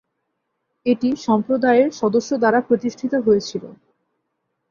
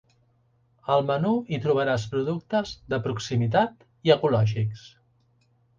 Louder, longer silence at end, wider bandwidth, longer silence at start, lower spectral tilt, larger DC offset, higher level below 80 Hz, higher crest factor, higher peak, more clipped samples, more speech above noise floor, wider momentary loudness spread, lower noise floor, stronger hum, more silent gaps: first, -19 LUFS vs -25 LUFS; about the same, 0.95 s vs 0.9 s; about the same, 7.2 kHz vs 7.4 kHz; about the same, 0.85 s vs 0.85 s; about the same, -5.5 dB/octave vs -6.5 dB/octave; neither; about the same, -62 dBFS vs -58 dBFS; about the same, 16 dB vs 20 dB; about the same, -4 dBFS vs -6 dBFS; neither; first, 57 dB vs 41 dB; about the same, 6 LU vs 8 LU; first, -75 dBFS vs -65 dBFS; neither; neither